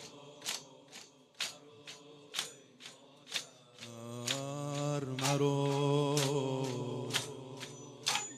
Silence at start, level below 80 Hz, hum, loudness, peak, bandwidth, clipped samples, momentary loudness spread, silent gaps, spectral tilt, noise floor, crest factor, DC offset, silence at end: 0 s; -80 dBFS; none; -36 LUFS; -14 dBFS; 15.5 kHz; under 0.1%; 20 LU; none; -4 dB/octave; -56 dBFS; 22 dB; under 0.1%; 0 s